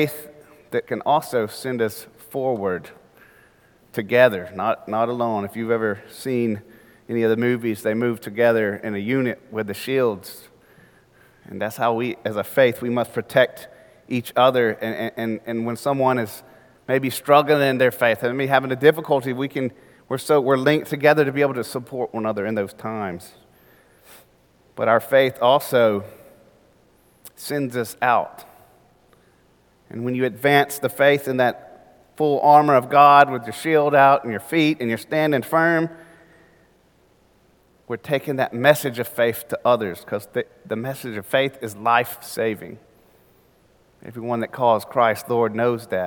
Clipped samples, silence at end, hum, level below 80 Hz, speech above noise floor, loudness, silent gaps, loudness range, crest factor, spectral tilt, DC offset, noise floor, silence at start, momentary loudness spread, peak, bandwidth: under 0.1%; 0 s; none; -66 dBFS; 38 dB; -20 LUFS; none; 9 LU; 22 dB; -5.5 dB/octave; under 0.1%; -58 dBFS; 0 s; 13 LU; 0 dBFS; 19 kHz